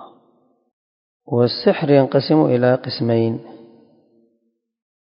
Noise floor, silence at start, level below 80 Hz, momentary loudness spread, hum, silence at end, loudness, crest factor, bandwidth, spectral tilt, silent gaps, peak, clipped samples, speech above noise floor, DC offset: -69 dBFS; 0 s; -64 dBFS; 8 LU; none; 1.55 s; -17 LUFS; 20 dB; 5.4 kHz; -11.5 dB/octave; 0.73-1.20 s; 0 dBFS; under 0.1%; 53 dB; under 0.1%